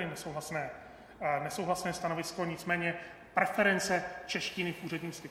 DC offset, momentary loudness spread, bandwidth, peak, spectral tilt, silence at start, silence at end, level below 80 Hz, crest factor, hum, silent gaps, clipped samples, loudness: under 0.1%; 11 LU; 16.5 kHz; -12 dBFS; -4 dB/octave; 0 s; 0 s; -64 dBFS; 22 dB; none; none; under 0.1%; -34 LUFS